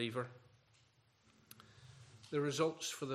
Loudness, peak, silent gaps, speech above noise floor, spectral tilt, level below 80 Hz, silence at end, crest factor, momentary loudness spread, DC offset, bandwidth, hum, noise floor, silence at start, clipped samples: -40 LUFS; -22 dBFS; none; 33 dB; -4.5 dB/octave; -82 dBFS; 0 s; 22 dB; 23 LU; under 0.1%; 15 kHz; none; -72 dBFS; 0 s; under 0.1%